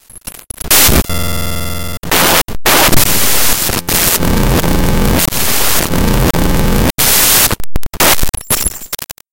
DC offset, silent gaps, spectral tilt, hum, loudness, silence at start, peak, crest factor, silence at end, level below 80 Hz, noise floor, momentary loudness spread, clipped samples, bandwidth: under 0.1%; none; -3 dB/octave; none; -10 LUFS; 0.1 s; 0 dBFS; 10 dB; 0.2 s; -20 dBFS; -31 dBFS; 14 LU; 0.2%; over 20 kHz